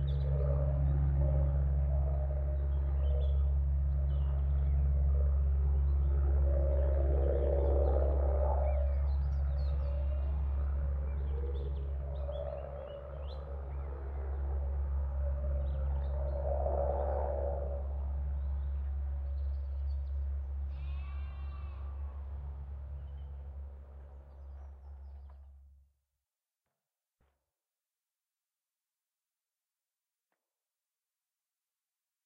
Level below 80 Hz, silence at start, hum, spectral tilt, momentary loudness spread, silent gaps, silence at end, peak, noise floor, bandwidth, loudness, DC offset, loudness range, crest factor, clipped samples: -34 dBFS; 0 s; none; -10 dB/octave; 14 LU; none; 6.65 s; -18 dBFS; under -90 dBFS; 3.7 kHz; -34 LUFS; under 0.1%; 15 LU; 16 dB; under 0.1%